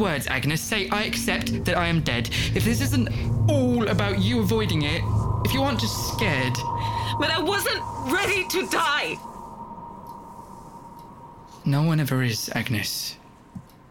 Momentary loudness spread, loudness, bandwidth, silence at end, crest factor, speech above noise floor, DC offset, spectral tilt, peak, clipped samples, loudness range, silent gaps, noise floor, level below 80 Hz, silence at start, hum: 20 LU; -24 LUFS; 19 kHz; 0.25 s; 16 dB; 21 dB; under 0.1%; -5 dB/octave; -8 dBFS; under 0.1%; 5 LU; none; -44 dBFS; -40 dBFS; 0 s; none